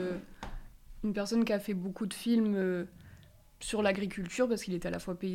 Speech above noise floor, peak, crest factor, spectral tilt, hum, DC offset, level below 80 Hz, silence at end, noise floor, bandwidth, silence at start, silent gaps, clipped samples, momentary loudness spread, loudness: 25 dB; -16 dBFS; 18 dB; -5.5 dB/octave; none; under 0.1%; -54 dBFS; 0 s; -57 dBFS; 16 kHz; 0 s; none; under 0.1%; 15 LU; -33 LUFS